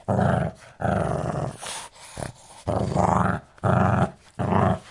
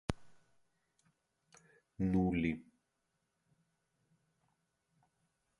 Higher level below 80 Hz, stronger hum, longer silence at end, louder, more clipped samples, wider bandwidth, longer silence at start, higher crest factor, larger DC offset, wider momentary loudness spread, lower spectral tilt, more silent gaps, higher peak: first, -46 dBFS vs -58 dBFS; neither; second, 0 s vs 3 s; first, -25 LUFS vs -36 LUFS; neither; about the same, 11.5 kHz vs 11 kHz; about the same, 0.1 s vs 0.1 s; second, 18 dB vs 26 dB; neither; about the same, 14 LU vs 14 LU; about the same, -7 dB/octave vs -8 dB/octave; neither; first, -6 dBFS vs -16 dBFS